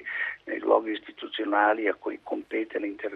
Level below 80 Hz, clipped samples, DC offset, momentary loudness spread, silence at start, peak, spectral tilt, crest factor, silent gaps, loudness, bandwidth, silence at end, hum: -74 dBFS; under 0.1%; under 0.1%; 11 LU; 0 s; -6 dBFS; -5.5 dB/octave; 22 dB; none; -28 LUFS; 4.9 kHz; 0 s; none